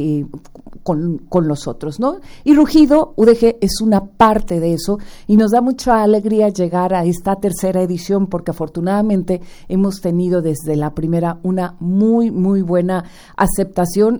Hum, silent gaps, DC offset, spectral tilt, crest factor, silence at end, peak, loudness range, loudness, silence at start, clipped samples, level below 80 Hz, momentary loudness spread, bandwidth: none; none; under 0.1%; -7 dB/octave; 16 dB; 0 s; 0 dBFS; 5 LU; -16 LUFS; 0 s; under 0.1%; -36 dBFS; 10 LU; over 20 kHz